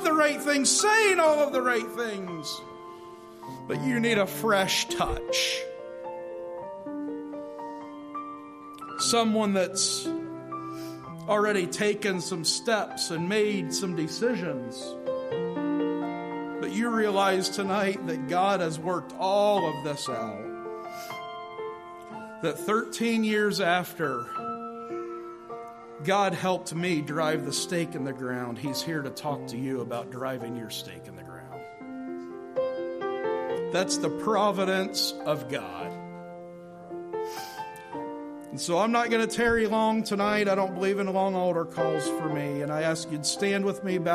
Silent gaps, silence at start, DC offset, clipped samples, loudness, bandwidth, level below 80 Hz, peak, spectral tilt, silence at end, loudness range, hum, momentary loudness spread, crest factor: none; 0 s; under 0.1%; under 0.1%; -28 LUFS; 15 kHz; -58 dBFS; -10 dBFS; -3.5 dB/octave; 0 s; 8 LU; none; 15 LU; 18 dB